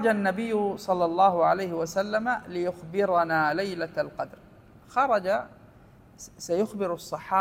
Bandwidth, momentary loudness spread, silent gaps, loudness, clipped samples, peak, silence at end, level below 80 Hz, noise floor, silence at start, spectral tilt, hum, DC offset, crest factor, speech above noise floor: 16 kHz; 12 LU; none; -27 LUFS; under 0.1%; -8 dBFS; 0 s; -62 dBFS; -53 dBFS; 0 s; -5.5 dB/octave; none; under 0.1%; 18 dB; 27 dB